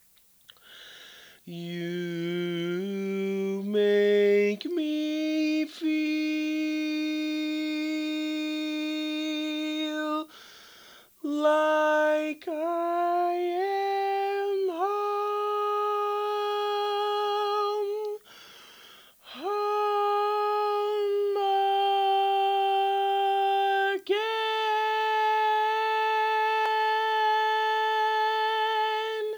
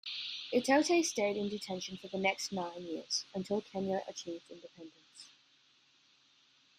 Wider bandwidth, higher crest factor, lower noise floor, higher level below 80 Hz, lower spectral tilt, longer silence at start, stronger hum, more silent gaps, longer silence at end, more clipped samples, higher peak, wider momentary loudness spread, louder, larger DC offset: first, over 20 kHz vs 14 kHz; second, 14 dB vs 22 dB; second, -58 dBFS vs -68 dBFS; about the same, -82 dBFS vs -78 dBFS; first, -5 dB/octave vs -3.5 dB/octave; first, 0.7 s vs 0.05 s; neither; neither; second, 0 s vs 1.5 s; neither; about the same, -12 dBFS vs -14 dBFS; second, 7 LU vs 24 LU; first, -27 LUFS vs -35 LUFS; neither